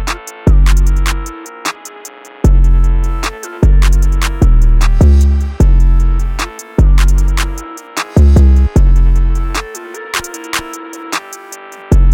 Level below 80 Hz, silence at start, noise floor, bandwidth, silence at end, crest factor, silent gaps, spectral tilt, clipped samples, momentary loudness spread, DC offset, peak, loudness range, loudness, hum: -10 dBFS; 0 s; -33 dBFS; 16 kHz; 0 s; 8 dB; none; -5.5 dB/octave; under 0.1%; 17 LU; under 0.1%; 0 dBFS; 3 LU; -13 LUFS; none